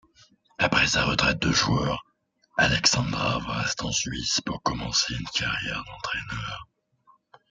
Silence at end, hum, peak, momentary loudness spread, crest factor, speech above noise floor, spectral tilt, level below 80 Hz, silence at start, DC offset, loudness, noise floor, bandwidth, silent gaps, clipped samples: 0.85 s; none; -4 dBFS; 12 LU; 22 dB; 42 dB; -3 dB/octave; -46 dBFS; 0.6 s; under 0.1%; -25 LUFS; -67 dBFS; 10.5 kHz; none; under 0.1%